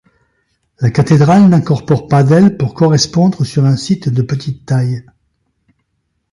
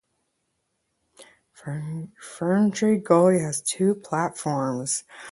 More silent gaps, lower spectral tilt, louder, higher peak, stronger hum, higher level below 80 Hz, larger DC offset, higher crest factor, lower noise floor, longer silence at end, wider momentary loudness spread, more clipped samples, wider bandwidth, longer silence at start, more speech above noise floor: neither; first, -7 dB/octave vs -5.5 dB/octave; first, -12 LUFS vs -23 LUFS; first, 0 dBFS vs -4 dBFS; neither; first, -46 dBFS vs -68 dBFS; neither; second, 12 dB vs 22 dB; second, -67 dBFS vs -75 dBFS; first, 1.3 s vs 0 s; second, 9 LU vs 16 LU; neither; about the same, 11.5 kHz vs 12 kHz; second, 0.8 s vs 1.2 s; first, 56 dB vs 52 dB